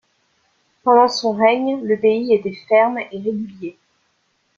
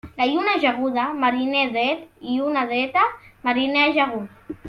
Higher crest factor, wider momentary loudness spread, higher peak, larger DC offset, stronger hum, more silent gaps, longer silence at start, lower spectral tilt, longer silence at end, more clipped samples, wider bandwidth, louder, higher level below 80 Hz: about the same, 18 dB vs 16 dB; first, 13 LU vs 9 LU; first, -2 dBFS vs -6 dBFS; neither; neither; neither; first, 0.85 s vs 0.05 s; about the same, -5 dB/octave vs -5.5 dB/octave; first, 0.85 s vs 0 s; neither; first, 7.4 kHz vs 6.4 kHz; first, -17 LUFS vs -21 LUFS; second, -66 dBFS vs -60 dBFS